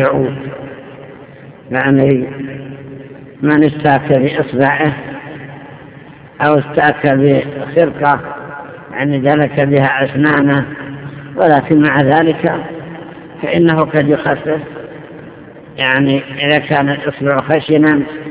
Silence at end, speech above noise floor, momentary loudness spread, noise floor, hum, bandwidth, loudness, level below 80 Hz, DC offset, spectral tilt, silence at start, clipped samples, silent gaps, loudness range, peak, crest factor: 0 s; 24 dB; 20 LU; -36 dBFS; none; 4 kHz; -13 LUFS; -48 dBFS; under 0.1%; -10.5 dB/octave; 0 s; 0.3%; none; 3 LU; 0 dBFS; 14 dB